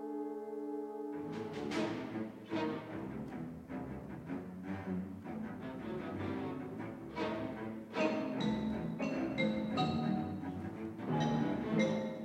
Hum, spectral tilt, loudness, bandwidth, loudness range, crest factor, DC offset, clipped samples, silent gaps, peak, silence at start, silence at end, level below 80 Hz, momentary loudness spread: none; -7 dB/octave; -39 LUFS; 11.5 kHz; 6 LU; 20 dB; under 0.1%; under 0.1%; none; -18 dBFS; 0 s; 0 s; -64 dBFS; 10 LU